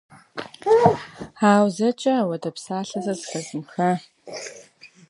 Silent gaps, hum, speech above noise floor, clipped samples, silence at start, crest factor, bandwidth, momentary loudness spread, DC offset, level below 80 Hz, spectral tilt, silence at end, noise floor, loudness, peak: none; none; 28 dB; under 0.1%; 0.35 s; 22 dB; 11.5 kHz; 19 LU; under 0.1%; -62 dBFS; -5.5 dB/octave; 0.25 s; -49 dBFS; -22 LUFS; -2 dBFS